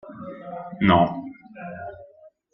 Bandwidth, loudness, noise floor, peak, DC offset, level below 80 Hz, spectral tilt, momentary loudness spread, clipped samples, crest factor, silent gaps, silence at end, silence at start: 5.8 kHz; -20 LUFS; -51 dBFS; -4 dBFS; under 0.1%; -56 dBFS; -10 dB/octave; 21 LU; under 0.1%; 22 dB; none; 0.25 s; 0.05 s